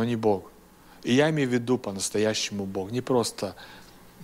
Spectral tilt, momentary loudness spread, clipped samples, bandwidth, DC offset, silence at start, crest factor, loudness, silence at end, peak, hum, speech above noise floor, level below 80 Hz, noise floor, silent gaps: -4.5 dB/octave; 13 LU; under 0.1%; 16 kHz; under 0.1%; 0 s; 18 dB; -26 LUFS; 0 s; -8 dBFS; none; 26 dB; -60 dBFS; -52 dBFS; none